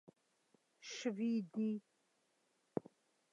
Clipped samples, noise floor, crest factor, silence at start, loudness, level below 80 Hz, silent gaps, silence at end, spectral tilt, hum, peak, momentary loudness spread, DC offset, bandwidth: under 0.1%; -80 dBFS; 22 dB; 0.8 s; -42 LUFS; -88 dBFS; none; 0.5 s; -5.5 dB/octave; none; -22 dBFS; 10 LU; under 0.1%; 7.8 kHz